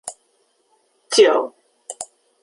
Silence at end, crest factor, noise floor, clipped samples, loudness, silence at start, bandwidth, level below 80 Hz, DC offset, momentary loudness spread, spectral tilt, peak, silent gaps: 0.4 s; 20 dB; -64 dBFS; under 0.1%; -16 LUFS; 0.05 s; 11.5 kHz; -74 dBFS; under 0.1%; 21 LU; -1 dB/octave; -2 dBFS; none